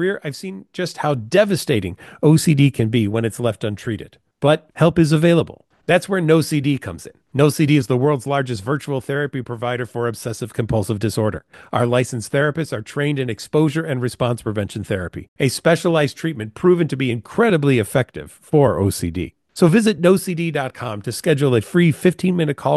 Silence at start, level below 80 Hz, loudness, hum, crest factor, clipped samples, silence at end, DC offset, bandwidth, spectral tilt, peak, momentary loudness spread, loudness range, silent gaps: 0 s; -50 dBFS; -19 LUFS; none; 16 dB; under 0.1%; 0 s; under 0.1%; 12.5 kHz; -6.5 dB/octave; -2 dBFS; 11 LU; 4 LU; 15.28-15.36 s